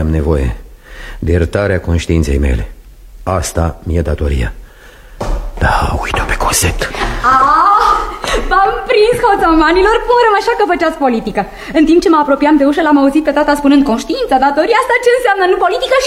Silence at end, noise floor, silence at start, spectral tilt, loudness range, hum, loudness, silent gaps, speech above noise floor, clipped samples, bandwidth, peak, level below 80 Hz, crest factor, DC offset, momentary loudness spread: 0 s; -36 dBFS; 0 s; -5 dB/octave; 7 LU; none; -12 LUFS; none; 25 dB; under 0.1%; 16 kHz; 0 dBFS; -22 dBFS; 12 dB; under 0.1%; 10 LU